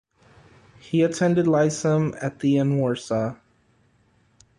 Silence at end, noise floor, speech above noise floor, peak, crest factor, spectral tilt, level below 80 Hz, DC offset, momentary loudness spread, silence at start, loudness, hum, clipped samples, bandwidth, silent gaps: 1.25 s; -62 dBFS; 41 dB; -8 dBFS; 16 dB; -6.5 dB/octave; -60 dBFS; under 0.1%; 7 LU; 0.9 s; -22 LUFS; none; under 0.1%; 11.5 kHz; none